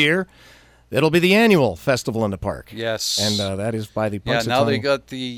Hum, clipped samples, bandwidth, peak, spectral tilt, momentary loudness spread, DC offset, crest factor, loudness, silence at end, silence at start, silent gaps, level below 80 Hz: none; under 0.1%; 17.5 kHz; -4 dBFS; -4.5 dB/octave; 11 LU; under 0.1%; 16 dB; -20 LUFS; 0 s; 0 s; none; -48 dBFS